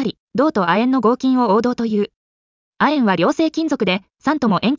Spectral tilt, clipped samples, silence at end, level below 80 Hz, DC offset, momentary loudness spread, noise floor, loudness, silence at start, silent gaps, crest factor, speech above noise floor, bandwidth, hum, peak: -6.5 dB/octave; under 0.1%; 0 s; -58 dBFS; under 0.1%; 6 LU; under -90 dBFS; -18 LUFS; 0 s; 0.19-0.27 s, 2.16-2.72 s; 12 dB; over 73 dB; 7.6 kHz; none; -4 dBFS